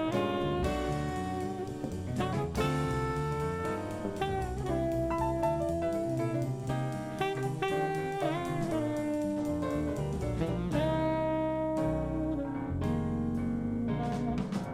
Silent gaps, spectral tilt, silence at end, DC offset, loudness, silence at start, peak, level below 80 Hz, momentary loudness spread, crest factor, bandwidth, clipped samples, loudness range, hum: none; -7 dB/octave; 0 s; under 0.1%; -33 LUFS; 0 s; -16 dBFS; -46 dBFS; 4 LU; 14 dB; 15.5 kHz; under 0.1%; 1 LU; none